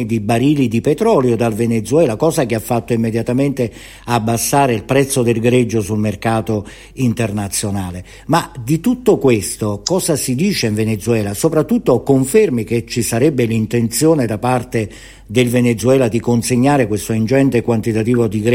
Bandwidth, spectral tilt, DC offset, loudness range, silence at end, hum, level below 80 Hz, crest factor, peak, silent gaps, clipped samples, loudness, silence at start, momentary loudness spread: 16.5 kHz; -5.5 dB/octave; under 0.1%; 3 LU; 0 s; none; -42 dBFS; 14 dB; -2 dBFS; none; under 0.1%; -15 LUFS; 0 s; 6 LU